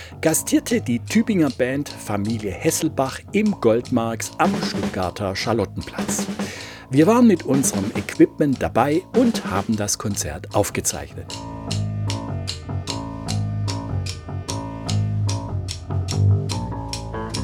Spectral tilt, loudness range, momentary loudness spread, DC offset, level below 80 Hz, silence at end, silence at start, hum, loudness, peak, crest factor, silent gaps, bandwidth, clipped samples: -5 dB/octave; 8 LU; 10 LU; under 0.1%; -44 dBFS; 0 s; 0 s; none; -22 LUFS; -2 dBFS; 20 dB; none; 19 kHz; under 0.1%